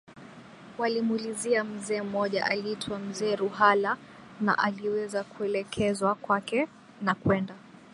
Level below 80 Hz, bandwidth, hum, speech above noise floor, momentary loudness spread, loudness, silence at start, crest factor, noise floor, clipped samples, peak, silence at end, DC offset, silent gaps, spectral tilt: -62 dBFS; 11.5 kHz; none; 20 dB; 10 LU; -28 LUFS; 0.1 s; 22 dB; -48 dBFS; under 0.1%; -8 dBFS; 0.1 s; under 0.1%; none; -5 dB/octave